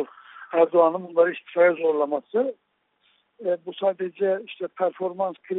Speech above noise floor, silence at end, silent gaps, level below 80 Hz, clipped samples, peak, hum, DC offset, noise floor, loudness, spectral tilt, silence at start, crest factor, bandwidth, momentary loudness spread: 44 dB; 0 s; none; -76 dBFS; under 0.1%; -6 dBFS; none; under 0.1%; -67 dBFS; -24 LUFS; -4 dB/octave; 0 s; 18 dB; 4 kHz; 10 LU